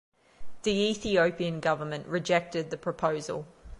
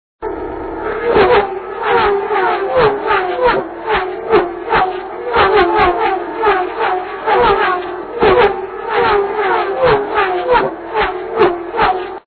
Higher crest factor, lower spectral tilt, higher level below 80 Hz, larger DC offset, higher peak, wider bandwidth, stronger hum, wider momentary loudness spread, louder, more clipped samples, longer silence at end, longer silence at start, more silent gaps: about the same, 18 dB vs 14 dB; second, -5 dB/octave vs -8 dB/octave; second, -56 dBFS vs -38 dBFS; neither; second, -12 dBFS vs 0 dBFS; first, 11.5 kHz vs 4.6 kHz; neither; about the same, 9 LU vs 9 LU; second, -29 LUFS vs -14 LUFS; neither; about the same, 0 s vs 0.1 s; first, 0.4 s vs 0.2 s; neither